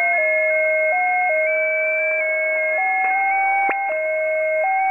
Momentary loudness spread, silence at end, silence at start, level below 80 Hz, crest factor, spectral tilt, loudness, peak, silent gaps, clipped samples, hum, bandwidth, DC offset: 3 LU; 0 s; 0 s; -76 dBFS; 12 dB; -3.5 dB/octave; -18 LUFS; -8 dBFS; none; under 0.1%; none; 8 kHz; 0.1%